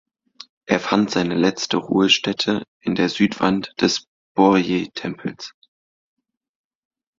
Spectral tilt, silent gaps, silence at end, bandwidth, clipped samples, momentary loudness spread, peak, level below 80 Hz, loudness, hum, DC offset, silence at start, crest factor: -4.5 dB/octave; 2.68-2.80 s, 4.08-4.35 s; 1.7 s; 7.6 kHz; under 0.1%; 13 LU; -2 dBFS; -58 dBFS; -20 LUFS; none; under 0.1%; 0.7 s; 20 dB